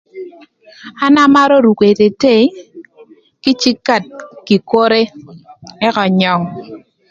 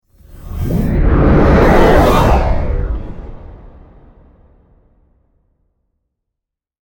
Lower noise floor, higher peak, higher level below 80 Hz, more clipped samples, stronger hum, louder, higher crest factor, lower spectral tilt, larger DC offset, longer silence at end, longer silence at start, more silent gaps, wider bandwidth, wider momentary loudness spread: second, -44 dBFS vs -81 dBFS; about the same, 0 dBFS vs 0 dBFS; second, -56 dBFS vs -18 dBFS; neither; neither; about the same, -12 LUFS vs -12 LUFS; about the same, 14 dB vs 14 dB; second, -5.5 dB/octave vs -7.5 dB/octave; neither; second, 0.35 s vs 3.15 s; second, 0.15 s vs 0.35 s; neither; second, 7.6 kHz vs 19 kHz; about the same, 21 LU vs 21 LU